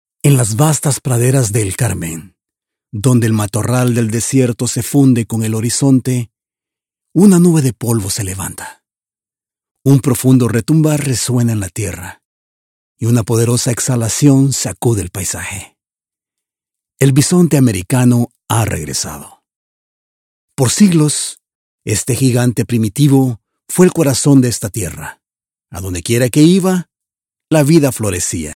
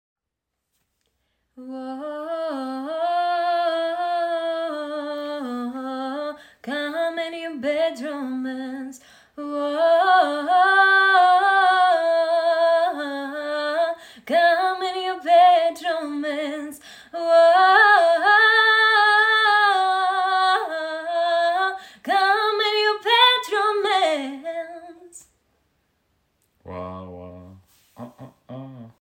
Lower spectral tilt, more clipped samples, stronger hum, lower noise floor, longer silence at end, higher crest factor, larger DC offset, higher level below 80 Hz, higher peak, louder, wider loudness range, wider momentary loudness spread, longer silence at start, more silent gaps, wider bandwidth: first, -5.5 dB/octave vs -3 dB/octave; neither; neither; first, under -90 dBFS vs -82 dBFS; about the same, 0.05 s vs 0.15 s; about the same, 14 dB vs 18 dB; neither; first, -46 dBFS vs -72 dBFS; about the same, 0 dBFS vs -2 dBFS; first, -13 LUFS vs -19 LUFS; second, 3 LU vs 12 LU; second, 13 LU vs 19 LU; second, 0.25 s vs 1.6 s; first, 9.71-9.75 s, 12.25-12.95 s, 19.56-20.48 s, 21.55-21.79 s vs none; about the same, 16.5 kHz vs 16.5 kHz